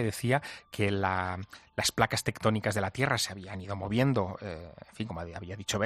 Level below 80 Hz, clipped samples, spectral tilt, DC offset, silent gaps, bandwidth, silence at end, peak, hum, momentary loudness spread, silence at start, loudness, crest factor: -58 dBFS; under 0.1%; -4.5 dB/octave; under 0.1%; none; 14 kHz; 0 s; -8 dBFS; none; 13 LU; 0 s; -31 LUFS; 24 dB